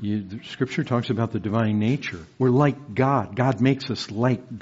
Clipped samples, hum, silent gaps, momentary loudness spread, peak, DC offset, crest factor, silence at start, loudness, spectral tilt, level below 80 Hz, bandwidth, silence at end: under 0.1%; none; none; 8 LU; -6 dBFS; under 0.1%; 18 dB; 0 s; -24 LUFS; -6.5 dB/octave; -60 dBFS; 8 kHz; 0 s